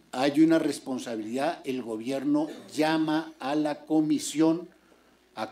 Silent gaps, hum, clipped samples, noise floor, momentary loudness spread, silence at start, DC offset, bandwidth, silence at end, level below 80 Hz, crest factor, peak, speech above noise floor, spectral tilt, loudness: none; none; under 0.1%; -60 dBFS; 11 LU; 0.15 s; under 0.1%; 15 kHz; 0 s; -74 dBFS; 18 dB; -10 dBFS; 34 dB; -5 dB/octave; -27 LUFS